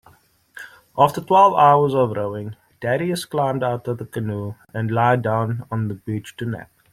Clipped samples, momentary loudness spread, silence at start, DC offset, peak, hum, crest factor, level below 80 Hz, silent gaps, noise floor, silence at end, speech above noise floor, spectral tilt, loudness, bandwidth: under 0.1%; 17 LU; 0.55 s; under 0.1%; -2 dBFS; none; 18 dB; -58 dBFS; none; -55 dBFS; 0.3 s; 36 dB; -7 dB/octave; -20 LUFS; 15.5 kHz